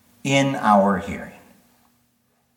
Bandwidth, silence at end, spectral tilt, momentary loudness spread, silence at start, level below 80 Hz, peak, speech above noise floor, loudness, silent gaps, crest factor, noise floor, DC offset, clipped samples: 16.5 kHz; 1.25 s; -5.5 dB/octave; 17 LU; 0.25 s; -56 dBFS; -2 dBFS; 47 dB; -19 LUFS; none; 20 dB; -66 dBFS; under 0.1%; under 0.1%